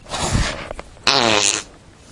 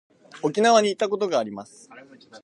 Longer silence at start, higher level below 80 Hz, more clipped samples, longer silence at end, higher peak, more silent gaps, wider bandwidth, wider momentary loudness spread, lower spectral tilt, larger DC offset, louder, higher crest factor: second, 0.05 s vs 0.35 s; first, -34 dBFS vs -76 dBFS; neither; first, 0.35 s vs 0.05 s; first, 0 dBFS vs -4 dBFS; neither; about the same, 11.5 kHz vs 11 kHz; about the same, 14 LU vs 14 LU; second, -2 dB/octave vs -3.5 dB/octave; neither; first, -17 LUFS vs -22 LUFS; about the same, 20 dB vs 20 dB